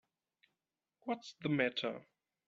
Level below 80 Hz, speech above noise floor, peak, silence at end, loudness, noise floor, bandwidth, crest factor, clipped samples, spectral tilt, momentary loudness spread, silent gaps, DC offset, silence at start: -82 dBFS; over 52 dB; -18 dBFS; 0.45 s; -38 LUFS; under -90 dBFS; 7.8 kHz; 24 dB; under 0.1%; -3.5 dB/octave; 14 LU; none; under 0.1%; 1.05 s